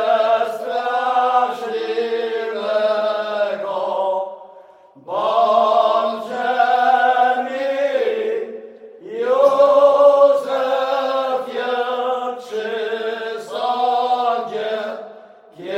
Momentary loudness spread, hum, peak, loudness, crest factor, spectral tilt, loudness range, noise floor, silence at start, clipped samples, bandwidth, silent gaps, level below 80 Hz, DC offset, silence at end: 12 LU; none; -2 dBFS; -18 LUFS; 18 dB; -3.5 dB/octave; 6 LU; -45 dBFS; 0 s; under 0.1%; 11 kHz; none; -76 dBFS; under 0.1%; 0 s